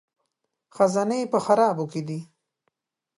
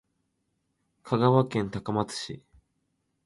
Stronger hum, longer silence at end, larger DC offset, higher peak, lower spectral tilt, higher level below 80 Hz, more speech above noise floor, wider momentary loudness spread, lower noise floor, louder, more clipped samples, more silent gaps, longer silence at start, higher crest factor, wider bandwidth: second, none vs 50 Hz at -50 dBFS; about the same, 0.95 s vs 0.85 s; neither; about the same, -6 dBFS vs -8 dBFS; about the same, -6 dB/octave vs -6.5 dB/octave; second, -76 dBFS vs -60 dBFS; first, 57 dB vs 51 dB; second, 12 LU vs 15 LU; about the same, -79 dBFS vs -77 dBFS; first, -23 LUFS vs -27 LUFS; neither; neither; second, 0.75 s vs 1.05 s; about the same, 20 dB vs 22 dB; about the same, 11.5 kHz vs 11.5 kHz